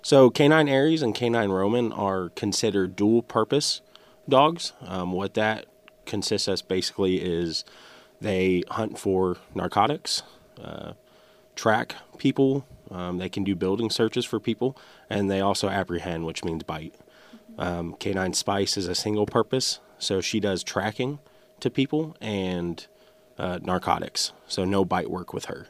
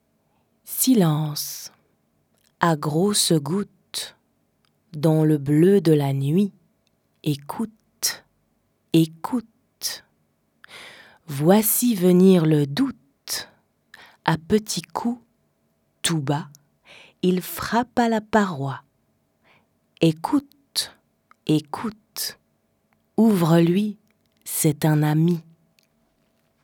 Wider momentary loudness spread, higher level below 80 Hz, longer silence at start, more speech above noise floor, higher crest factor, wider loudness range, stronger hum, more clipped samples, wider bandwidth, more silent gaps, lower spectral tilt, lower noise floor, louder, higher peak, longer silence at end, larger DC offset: second, 11 LU vs 15 LU; about the same, -58 dBFS vs -62 dBFS; second, 0.05 s vs 0.65 s; second, 31 dB vs 48 dB; about the same, 20 dB vs 22 dB; about the same, 5 LU vs 7 LU; neither; neither; second, 15.5 kHz vs 20 kHz; neither; about the same, -4.5 dB/octave vs -5.5 dB/octave; second, -56 dBFS vs -68 dBFS; second, -25 LUFS vs -22 LUFS; second, -6 dBFS vs -2 dBFS; second, 0.05 s vs 1.25 s; neither